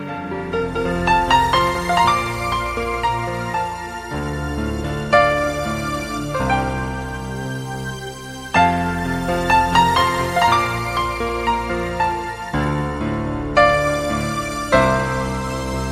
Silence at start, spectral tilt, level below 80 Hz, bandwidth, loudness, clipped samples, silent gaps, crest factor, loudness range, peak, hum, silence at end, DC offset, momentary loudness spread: 0 s; -5 dB/octave; -34 dBFS; 16 kHz; -19 LUFS; under 0.1%; none; 16 dB; 4 LU; -2 dBFS; none; 0 s; under 0.1%; 12 LU